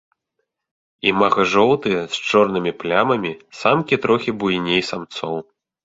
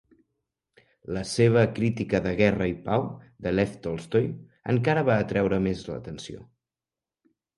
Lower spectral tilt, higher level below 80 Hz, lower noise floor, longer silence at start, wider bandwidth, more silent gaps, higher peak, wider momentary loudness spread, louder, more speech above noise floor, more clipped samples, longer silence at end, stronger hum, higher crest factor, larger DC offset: second, -5 dB/octave vs -7 dB/octave; second, -56 dBFS vs -50 dBFS; second, -76 dBFS vs under -90 dBFS; about the same, 1.05 s vs 1.1 s; second, 8 kHz vs 11.5 kHz; neither; first, -2 dBFS vs -6 dBFS; second, 11 LU vs 15 LU; first, -19 LUFS vs -26 LUFS; second, 57 dB vs over 65 dB; neither; second, 0.4 s vs 1.15 s; neither; about the same, 18 dB vs 20 dB; neither